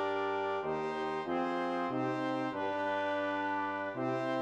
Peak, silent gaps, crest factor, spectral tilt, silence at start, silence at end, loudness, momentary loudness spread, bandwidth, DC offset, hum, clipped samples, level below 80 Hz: -22 dBFS; none; 12 dB; -6.5 dB/octave; 0 s; 0 s; -35 LUFS; 2 LU; 9.4 kHz; under 0.1%; none; under 0.1%; -76 dBFS